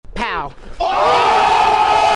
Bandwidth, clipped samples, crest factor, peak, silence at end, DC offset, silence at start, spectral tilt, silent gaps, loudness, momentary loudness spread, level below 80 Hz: 11 kHz; under 0.1%; 8 dB; -6 dBFS; 0 s; under 0.1%; 0.05 s; -3 dB/octave; none; -14 LUFS; 11 LU; -36 dBFS